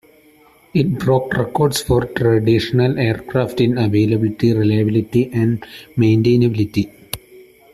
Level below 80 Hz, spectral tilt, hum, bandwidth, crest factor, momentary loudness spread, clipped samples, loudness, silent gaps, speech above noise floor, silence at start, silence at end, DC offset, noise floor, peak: -42 dBFS; -7 dB/octave; none; 14 kHz; 16 dB; 8 LU; under 0.1%; -17 LUFS; none; 34 dB; 0.75 s; 0.3 s; under 0.1%; -50 dBFS; -2 dBFS